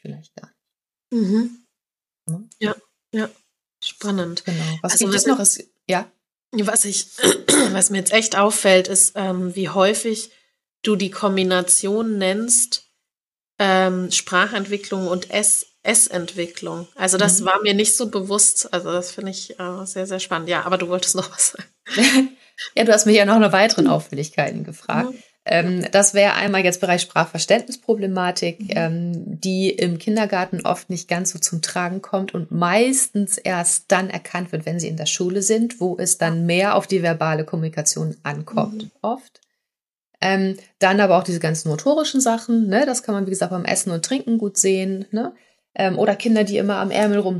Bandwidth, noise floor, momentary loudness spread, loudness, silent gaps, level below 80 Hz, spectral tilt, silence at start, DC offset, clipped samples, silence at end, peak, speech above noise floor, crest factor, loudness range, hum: 13 kHz; under -90 dBFS; 12 LU; -19 LUFS; 13.27-13.31 s; -74 dBFS; -3 dB/octave; 0.05 s; under 0.1%; under 0.1%; 0 s; -2 dBFS; over 71 dB; 18 dB; 6 LU; none